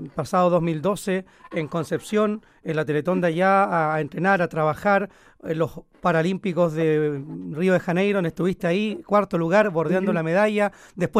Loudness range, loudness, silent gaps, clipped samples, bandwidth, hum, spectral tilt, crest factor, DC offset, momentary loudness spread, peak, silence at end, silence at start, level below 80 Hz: 2 LU; -23 LUFS; none; under 0.1%; 15 kHz; none; -7 dB/octave; 16 dB; under 0.1%; 9 LU; -6 dBFS; 0 s; 0 s; -56 dBFS